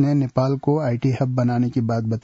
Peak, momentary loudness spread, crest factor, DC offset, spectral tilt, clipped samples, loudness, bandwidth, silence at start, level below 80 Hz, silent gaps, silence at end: -6 dBFS; 2 LU; 14 dB; under 0.1%; -9 dB/octave; under 0.1%; -21 LUFS; 7.4 kHz; 0 s; -54 dBFS; none; 0.05 s